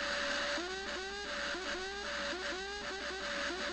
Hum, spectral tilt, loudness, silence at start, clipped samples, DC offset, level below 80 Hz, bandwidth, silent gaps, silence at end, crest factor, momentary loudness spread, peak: none; -1.5 dB/octave; -38 LUFS; 0 s; under 0.1%; under 0.1%; -58 dBFS; 12 kHz; none; 0 s; 14 dB; 5 LU; -24 dBFS